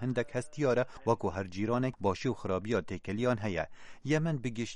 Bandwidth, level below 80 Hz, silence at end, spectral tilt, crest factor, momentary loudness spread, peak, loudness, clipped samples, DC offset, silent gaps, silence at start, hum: 10.5 kHz; -58 dBFS; 0 s; -6.5 dB/octave; 20 dB; 6 LU; -14 dBFS; -33 LUFS; under 0.1%; under 0.1%; none; 0 s; none